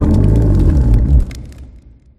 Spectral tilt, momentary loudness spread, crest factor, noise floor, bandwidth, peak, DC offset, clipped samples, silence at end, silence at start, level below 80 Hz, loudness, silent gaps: -9.5 dB/octave; 11 LU; 12 dB; -40 dBFS; 8.2 kHz; 0 dBFS; under 0.1%; under 0.1%; 0.55 s; 0 s; -14 dBFS; -13 LUFS; none